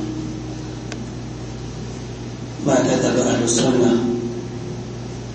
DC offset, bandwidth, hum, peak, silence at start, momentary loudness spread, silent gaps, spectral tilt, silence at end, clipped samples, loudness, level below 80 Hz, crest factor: under 0.1%; 8.8 kHz; none; -4 dBFS; 0 s; 14 LU; none; -5 dB/octave; 0 s; under 0.1%; -22 LUFS; -42 dBFS; 18 dB